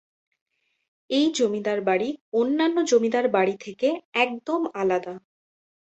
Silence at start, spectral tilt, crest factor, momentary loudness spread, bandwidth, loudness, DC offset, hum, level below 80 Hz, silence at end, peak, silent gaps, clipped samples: 1.1 s; -4 dB/octave; 18 dB; 6 LU; 8.2 kHz; -24 LUFS; under 0.1%; none; -70 dBFS; 0.75 s; -8 dBFS; 2.21-2.32 s, 4.05-4.12 s; under 0.1%